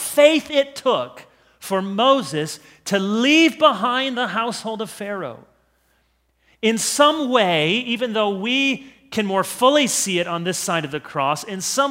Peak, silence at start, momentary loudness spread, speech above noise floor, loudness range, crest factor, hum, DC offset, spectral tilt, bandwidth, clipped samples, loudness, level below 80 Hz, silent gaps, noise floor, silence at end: 0 dBFS; 0 s; 13 LU; 45 dB; 4 LU; 20 dB; none; under 0.1%; -3 dB/octave; 16 kHz; under 0.1%; -19 LUFS; -66 dBFS; none; -64 dBFS; 0 s